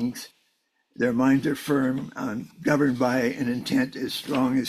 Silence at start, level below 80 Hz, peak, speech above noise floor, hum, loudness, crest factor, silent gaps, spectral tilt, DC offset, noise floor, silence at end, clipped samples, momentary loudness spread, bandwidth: 0 s; -60 dBFS; -8 dBFS; 47 dB; none; -25 LUFS; 18 dB; none; -5.5 dB/octave; under 0.1%; -71 dBFS; 0 s; under 0.1%; 10 LU; 15 kHz